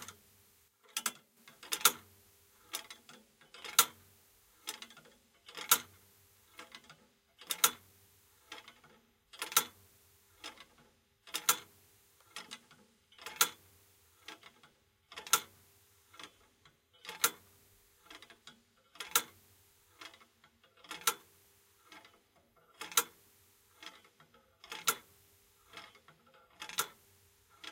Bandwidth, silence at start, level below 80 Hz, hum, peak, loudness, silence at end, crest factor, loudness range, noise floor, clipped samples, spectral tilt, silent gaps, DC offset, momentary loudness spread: 16.5 kHz; 0 s; -82 dBFS; none; -8 dBFS; -34 LUFS; 0 s; 34 dB; 7 LU; -69 dBFS; under 0.1%; 1.5 dB/octave; none; under 0.1%; 27 LU